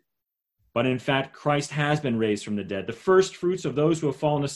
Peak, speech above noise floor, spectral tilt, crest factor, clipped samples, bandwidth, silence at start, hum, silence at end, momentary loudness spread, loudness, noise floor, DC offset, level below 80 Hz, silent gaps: -6 dBFS; 59 dB; -5.5 dB/octave; 18 dB; under 0.1%; 12 kHz; 0.75 s; none; 0 s; 8 LU; -25 LUFS; -83 dBFS; under 0.1%; -60 dBFS; none